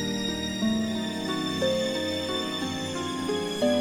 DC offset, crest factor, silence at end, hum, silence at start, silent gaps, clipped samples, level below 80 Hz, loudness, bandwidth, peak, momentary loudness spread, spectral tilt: under 0.1%; 16 dB; 0 s; none; 0 s; none; under 0.1%; -56 dBFS; -28 LUFS; over 20 kHz; -12 dBFS; 4 LU; -4.5 dB/octave